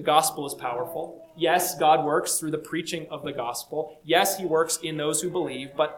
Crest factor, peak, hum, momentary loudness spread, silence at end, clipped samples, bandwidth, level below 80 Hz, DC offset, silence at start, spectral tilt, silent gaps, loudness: 22 dB; -4 dBFS; none; 11 LU; 0 s; under 0.1%; 19 kHz; -66 dBFS; under 0.1%; 0 s; -3 dB/octave; none; -26 LUFS